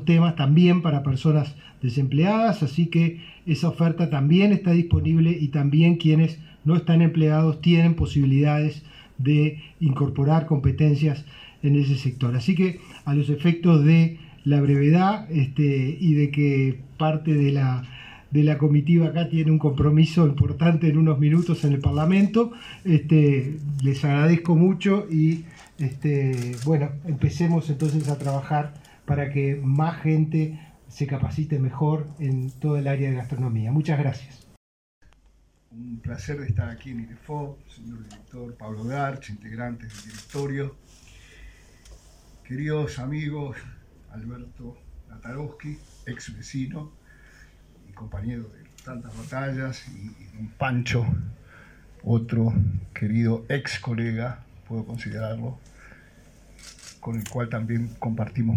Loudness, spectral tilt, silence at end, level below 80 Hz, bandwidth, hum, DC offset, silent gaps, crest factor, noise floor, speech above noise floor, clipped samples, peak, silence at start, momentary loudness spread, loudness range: -22 LUFS; -8 dB/octave; 0 s; -50 dBFS; 9.2 kHz; none; under 0.1%; 34.57-35.01 s; 18 dB; -59 dBFS; 37 dB; under 0.1%; -6 dBFS; 0 s; 20 LU; 15 LU